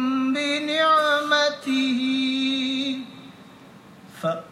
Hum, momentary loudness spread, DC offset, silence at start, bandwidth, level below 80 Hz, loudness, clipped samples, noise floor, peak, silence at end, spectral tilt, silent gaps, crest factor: none; 10 LU; under 0.1%; 0 s; 13 kHz; -74 dBFS; -22 LUFS; under 0.1%; -47 dBFS; -6 dBFS; 0 s; -3.5 dB/octave; none; 16 dB